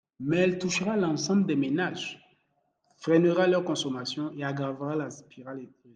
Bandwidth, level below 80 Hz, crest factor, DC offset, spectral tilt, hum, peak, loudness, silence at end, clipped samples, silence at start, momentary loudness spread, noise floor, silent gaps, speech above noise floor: 9.4 kHz; -70 dBFS; 18 dB; under 0.1%; -5.5 dB/octave; none; -10 dBFS; -27 LUFS; 0.25 s; under 0.1%; 0.2 s; 18 LU; -74 dBFS; none; 46 dB